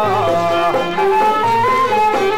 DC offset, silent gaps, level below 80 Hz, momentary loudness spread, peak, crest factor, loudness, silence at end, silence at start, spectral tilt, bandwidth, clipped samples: 2%; none; -46 dBFS; 2 LU; -6 dBFS; 8 dB; -15 LUFS; 0 s; 0 s; -5 dB/octave; 16.5 kHz; under 0.1%